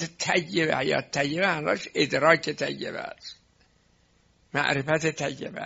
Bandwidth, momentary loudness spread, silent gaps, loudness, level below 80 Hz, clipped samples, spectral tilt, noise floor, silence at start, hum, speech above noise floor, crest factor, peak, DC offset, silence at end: 8 kHz; 13 LU; none; -25 LUFS; -64 dBFS; under 0.1%; -3 dB/octave; -64 dBFS; 0 s; none; 38 dB; 24 dB; -4 dBFS; under 0.1%; 0 s